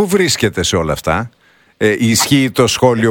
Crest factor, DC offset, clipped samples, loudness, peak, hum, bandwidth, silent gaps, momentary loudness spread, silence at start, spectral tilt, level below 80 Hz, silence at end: 14 dB; under 0.1%; under 0.1%; -13 LUFS; 0 dBFS; none; 19 kHz; none; 6 LU; 0 s; -4 dB/octave; -38 dBFS; 0 s